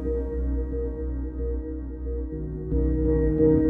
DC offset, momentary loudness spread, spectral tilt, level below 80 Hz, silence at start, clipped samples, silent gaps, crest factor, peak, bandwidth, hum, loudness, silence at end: under 0.1%; 10 LU; -13 dB/octave; -30 dBFS; 0 s; under 0.1%; none; 16 dB; -8 dBFS; 2 kHz; none; -28 LUFS; 0 s